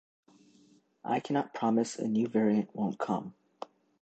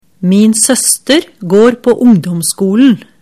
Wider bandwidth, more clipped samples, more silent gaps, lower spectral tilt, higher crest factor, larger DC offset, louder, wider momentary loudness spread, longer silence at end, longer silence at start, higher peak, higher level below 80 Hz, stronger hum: second, 9 kHz vs 16 kHz; neither; neither; first, -6.5 dB/octave vs -4.5 dB/octave; first, 18 dB vs 10 dB; neither; second, -31 LUFS vs -9 LUFS; first, 20 LU vs 4 LU; first, 0.7 s vs 0.2 s; first, 1.05 s vs 0.2 s; second, -16 dBFS vs 0 dBFS; second, -78 dBFS vs -50 dBFS; neither